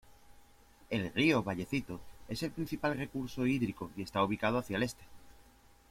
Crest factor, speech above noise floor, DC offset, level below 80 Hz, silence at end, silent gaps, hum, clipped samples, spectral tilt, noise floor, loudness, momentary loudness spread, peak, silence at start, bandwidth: 20 dB; 27 dB; under 0.1%; -60 dBFS; 0.5 s; none; none; under 0.1%; -6 dB/octave; -61 dBFS; -34 LUFS; 12 LU; -16 dBFS; 0.05 s; 16.5 kHz